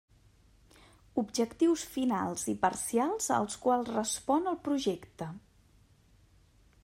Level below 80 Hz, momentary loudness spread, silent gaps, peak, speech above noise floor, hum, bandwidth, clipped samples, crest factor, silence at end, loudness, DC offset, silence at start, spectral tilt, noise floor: -64 dBFS; 10 LU; none; -14 dBFS; 32 dB; none; 16 kHz; under 0.1%; 20 dB; 1.45 s; -31 LUFS; under 0.1%; 1.15 s; -4 dB/octave; -63 dBFS